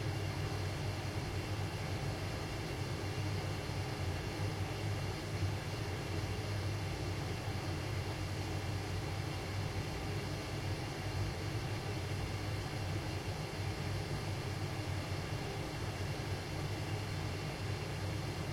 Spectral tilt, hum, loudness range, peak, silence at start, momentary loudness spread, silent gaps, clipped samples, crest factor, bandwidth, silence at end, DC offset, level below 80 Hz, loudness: -5.5 dB/octave; none; 1 LU; -26 dBFS; 0 s; 1 LU; none; under 0.1%; 12 dB; 16.5 kHz; 0 s; under 0.1%; -52 dBFS; -40 LUFS